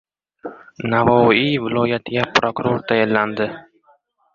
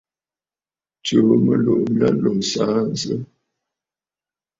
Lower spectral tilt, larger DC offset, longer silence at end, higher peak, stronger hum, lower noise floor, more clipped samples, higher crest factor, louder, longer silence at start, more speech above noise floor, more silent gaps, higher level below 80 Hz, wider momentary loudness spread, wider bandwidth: about the same, -6 dB/octave vs -6 dB/octave; neither; second, 0.75 s vs 1.35 s; about the same, 0 dBFS vs -2 dBFS; neither; second, -58 dBFS vs under -90 dBFS; neither; about the same, 18 dB vs 18 dB; about the same, -18 LUFS vs -18 LUFS; second, 0.45 s vs 1.05 s; second, 40 dB vs over 73 dB; neither; about the same, -52 dBFS vs -56 dBFS; first, 22 LU vs 10 LU; about the same, 7.4 kHz vs 7.8 kHz